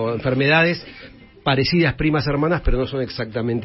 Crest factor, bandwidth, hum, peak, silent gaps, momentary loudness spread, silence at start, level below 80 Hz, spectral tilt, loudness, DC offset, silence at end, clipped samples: 16 dB; 5.8 kHz; none; -4 dBFS; none; 10 LU; 0 s; -32 dBFS; -9.5 dB/octave; -20 LUFS; under 0.1%; 0 s; under 0.1%